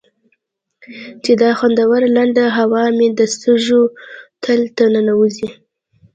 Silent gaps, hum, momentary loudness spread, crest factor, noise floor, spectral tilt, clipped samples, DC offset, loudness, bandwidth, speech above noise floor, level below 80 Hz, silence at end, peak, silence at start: none; none; 13 LU; 14 dB; -66 dBFS; -4.5 dB/octave; under 0.1%; under 0.1%; -14 LUFS; 9 kHz; 53 dB; -62 dBFS; 0.65 s; 0 dBFS; 0.9 s